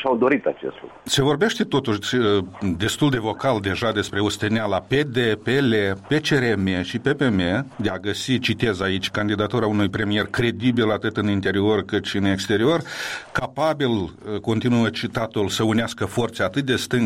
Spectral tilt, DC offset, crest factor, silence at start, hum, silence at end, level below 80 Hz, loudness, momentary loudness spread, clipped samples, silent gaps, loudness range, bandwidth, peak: -5.5 dB/octave; 0.1%; 14 dB; 0 s; none; 0 s; -50 dBFS; -22 LUFS; 6 LU; under 0.1%; none; 2 LU; 16 kHz; -8 dBFS